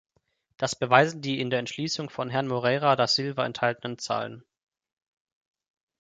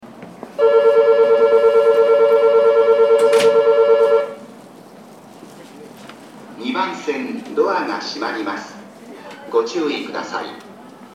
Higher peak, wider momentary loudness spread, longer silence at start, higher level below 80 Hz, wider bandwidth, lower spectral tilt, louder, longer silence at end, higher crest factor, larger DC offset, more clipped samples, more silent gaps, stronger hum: about the same, -2 dBFS vs -2 dBFS; second, 10 LU vs 16 LU; first, 0.6 s vs 0.05 s; about the same, -70 dBFS vs -74 dBFS; second, 9.4 kHz vs 11.5 kHz; about the same, -4.5 dB/octave vs -4 dB/octave; second, -26 LUFS vs -15 LUFS; first, 1.6 s vs 0.3 s; first, 26 dB vs 14 dB; neither; neither; neither; neither